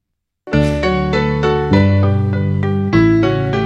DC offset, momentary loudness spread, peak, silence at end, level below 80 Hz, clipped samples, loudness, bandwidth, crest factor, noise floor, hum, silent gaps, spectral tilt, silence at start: under 0.1%; 5 LU; 0 dBFS; 0 s; -30 dBFS; under 0.1%; -15 LUFS; 8 kHz; 14 dB; -40 dBFS; none; none; -8 dB/octave; 0.45 s